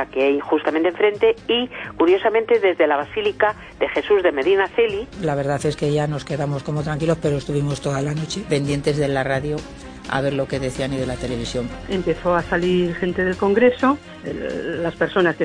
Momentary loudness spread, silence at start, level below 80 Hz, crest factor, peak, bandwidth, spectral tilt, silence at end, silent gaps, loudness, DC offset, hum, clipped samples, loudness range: 9 LU; 0 s; -42 dBFS; 16 dB; -4 dBFS; 10 kHz; -6 dB/octave; 0 s; none; -21 LUFS; under 0.1%; none; under 0.1%; 4 LU